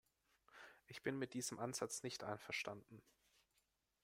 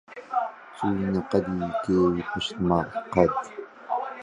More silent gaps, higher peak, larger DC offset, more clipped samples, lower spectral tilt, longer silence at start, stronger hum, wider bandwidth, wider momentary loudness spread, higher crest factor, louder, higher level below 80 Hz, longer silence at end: neither; second, -28 dBFS vs -4 dBFS; neither; neither; second, -3.5 dB/octave vs -7 dB/octave; first, 0.5 s vs 0.1 s; neither; first, 16 kHz vs 10.5 kHz; first, 18 LU vs 9 LU; about the same, 22 dB vs 22 dB; second, -47 LUFS vs -26 LUFS; second, -84 dBFS vs -50 dBFS; first, 1.05 s vs 0 s